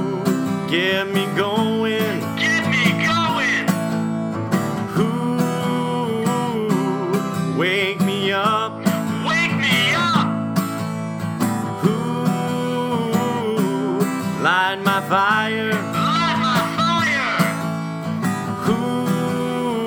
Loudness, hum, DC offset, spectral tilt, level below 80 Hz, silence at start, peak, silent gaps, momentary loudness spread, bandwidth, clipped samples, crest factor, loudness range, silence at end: -20 LUFS; none; under 0.1%; -5 dB/octave; -58 dBFS; 0 s; -2 dBFS; none; 6 LU; over 20 kHz; under 0.1%; 18 dB; 3 LU; 0 s